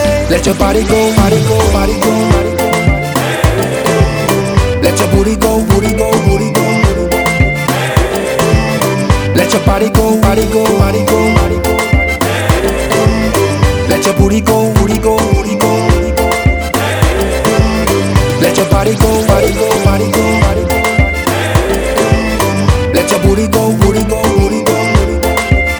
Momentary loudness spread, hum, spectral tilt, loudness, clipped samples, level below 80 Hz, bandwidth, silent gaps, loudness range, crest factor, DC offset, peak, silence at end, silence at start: 3 LU; none; -5.5 dB/octave; -11 LUFS; 0.4%; -18 dBFS; over 20 kHz; none; 1 LU; 10 dB; under 0.1%; 0 dBFS; 0 s; 0 s